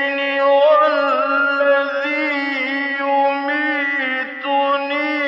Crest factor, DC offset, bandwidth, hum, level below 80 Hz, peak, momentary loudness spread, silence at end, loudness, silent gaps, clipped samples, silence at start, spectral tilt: 12 dB; under 0.1%; 6.2 kHz; none; under -90 dBFS; -4 dBFS; 6 LU; 0 s; -17 LUFS; none; under 0.1%; 0 s; -3 dB/octave